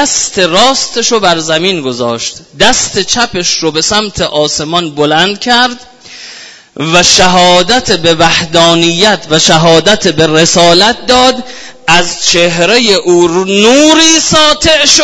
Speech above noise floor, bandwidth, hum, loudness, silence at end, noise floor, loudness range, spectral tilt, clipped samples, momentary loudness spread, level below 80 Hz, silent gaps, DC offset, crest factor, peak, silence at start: 23 dB; 11 kHz; none; -7 LUFS; 0 s; -31 dBFS; 4 LU; -2.5 dB/octave; 2%; 9 LU; -36 dBFS; none; under 0.1%; 8 dB; 0 dBFS; 0 s